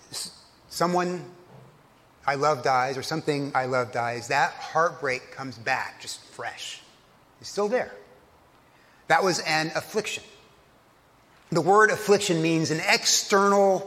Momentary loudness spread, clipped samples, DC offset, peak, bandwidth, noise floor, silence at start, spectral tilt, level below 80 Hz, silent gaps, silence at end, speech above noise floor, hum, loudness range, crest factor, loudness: 17 LU; under 0.1%; under 0.1%; -4 dBFS; 16 kHz; -58 dBFS; 0.1 s; -3.5 dB/octave; -68 dBFS; none; 0 s; 34 dB; none; 8 LU; 22 dB; -24 LUFS